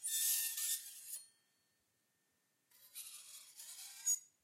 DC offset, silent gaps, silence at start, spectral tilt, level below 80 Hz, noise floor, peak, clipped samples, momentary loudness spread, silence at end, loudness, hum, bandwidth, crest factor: under 0.1%; none; 0 s; 6 dB/octave; under -90 dBFS; -82 dBFS; -24 dBFS; under 0.1%; 18 LU; 0.15 s; -38 LUFS; none; 16 kHz; 20 dB